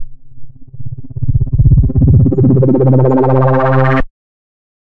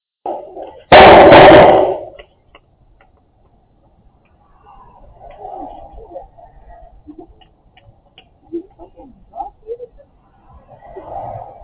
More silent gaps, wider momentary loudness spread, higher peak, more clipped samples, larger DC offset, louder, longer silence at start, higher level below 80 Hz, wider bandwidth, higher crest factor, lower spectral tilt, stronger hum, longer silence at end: neither; second, 19 LU vs 29 LU; about the same, 0 dBFS vs 0 dBFS; second, under 0.1% vs 1%; first, 8% vs under 0.1%; second, -11 LUFS vs -5 LUFS; second, 0 s vs 0.25 s; first, -22 dBFS vs -36 dBFS; about the same, 3.8 kHz vs 4 kHz; about the same, 12 dB vs 14 dB; first, -11.5 dB/octave vs -9 dB/octave; neither; first, 0.9 s vs 0.25 s